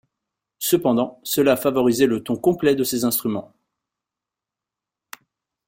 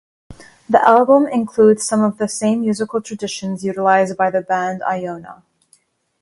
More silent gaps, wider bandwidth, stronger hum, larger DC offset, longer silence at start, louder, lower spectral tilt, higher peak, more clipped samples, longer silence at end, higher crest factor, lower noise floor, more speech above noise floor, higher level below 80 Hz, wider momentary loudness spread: neither; first, 16.5 kHz vs 11.5 kHz; neither; neither; first, 0.6 s vs 0.3 s; second, -20 LUFS vs -16 LUFS; about the same, -4.5 dB/octave vs -5 dB/octave; second, -4 dBFS vs 0 dBFS; neither; first, 2.25 s vs 0.9 s; about the same, 18 dB vs 16 dB; first, -87 dBFS vs -58 dBFS; first, 68 dB vs 42 dB; about the same, -60 dBFS vs -58 dBFS; second, 5 LU vs 12 LU